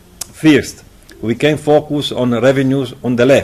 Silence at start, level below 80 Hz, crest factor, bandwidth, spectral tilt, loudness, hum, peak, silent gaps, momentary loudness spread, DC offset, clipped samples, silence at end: 0.35 s; -46 dBFS; 12 dB; 14.5 kHz; -6 dB/octave; -14 LUFS; none; 0 dBFS; none; 11 LU; under 0.1%; under 0.1%; 0 s